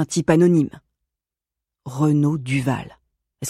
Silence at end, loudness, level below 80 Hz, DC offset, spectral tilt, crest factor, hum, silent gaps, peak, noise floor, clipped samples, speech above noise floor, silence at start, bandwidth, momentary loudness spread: 0 s; -19 LUFS; -54 dBFS; under 0.1%; -6.5 dB/octave; 18 dB; none; none; -4 dBFS; -87 dBFS; under 0.1%; 68 dB; 0 s; 14 kHz; 13 LU